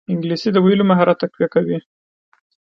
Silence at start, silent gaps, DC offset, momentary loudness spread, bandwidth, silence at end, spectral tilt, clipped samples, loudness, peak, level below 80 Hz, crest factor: 0.1 s; none; under 0.1%; 8 LU; 6.4 kHz; 1 s; -8 dB/octave; under 0.1%; -17 LUFS; 0 dBFS; -62 dBFS; 18 dB